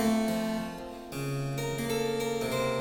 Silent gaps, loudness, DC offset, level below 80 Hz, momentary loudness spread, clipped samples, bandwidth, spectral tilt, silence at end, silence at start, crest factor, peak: none; -32 LUFS; under 0.1%; -54 dBFS; 9 LU; under 0.1%; 19 kHz; -5 dB/octave; 0 s; 0 s; 14 dB; -16 dBFS